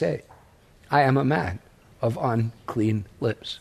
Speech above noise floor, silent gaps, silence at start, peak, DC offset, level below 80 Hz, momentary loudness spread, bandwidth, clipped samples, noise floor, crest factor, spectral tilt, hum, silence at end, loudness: 30 dB; none; 0 s; -6 dBFS; under 0.1%; -54 dBFS; 10 LU; 13 kHz; under 0.1%; -54 dBFS; 20 dB; -7.5 dB/octave; none; 0.05 s; -25 LUFS